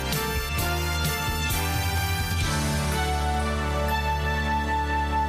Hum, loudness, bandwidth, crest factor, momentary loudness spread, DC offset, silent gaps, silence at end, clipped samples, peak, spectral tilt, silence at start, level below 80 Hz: none; -26 LUFS; 15.5 kHz; 14 dB; 1 LU; under 0.1%; none; 0 s; under 0.1%; -12 dBFS; -4 dB/octave; 0 s; -30 dBFS